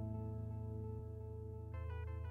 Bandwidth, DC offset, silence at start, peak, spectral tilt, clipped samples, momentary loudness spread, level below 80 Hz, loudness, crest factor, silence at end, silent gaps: 3.3 kHz; under 0.1%; 0 s; -36 dBFS; -10 dB/octave; under 0.1%; 4 LU; -52 dBFS; -47 LUFS; 10 dB; 0 s; none